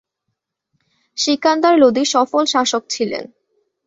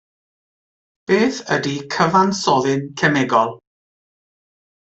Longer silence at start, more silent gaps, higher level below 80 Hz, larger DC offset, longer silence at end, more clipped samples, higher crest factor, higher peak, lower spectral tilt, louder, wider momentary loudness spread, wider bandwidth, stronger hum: about the same, 1.15 s vs 1.1 s; neither; about the same, -64 dBFS vs -60 dBFS; neither; second, 0.6 s vs 1.35 s; neither; about the same, 16 dB vs 18 dB; about the same, -2 dBFS vs -4 dBFS; second, -2.5 dB/octave vs -5 dB/octave; about the same, -16 LUFS vs -18 LUFS; first, 10 LU vs 7 LU; about the same, 8 kHz vs 8.2 kHz; neither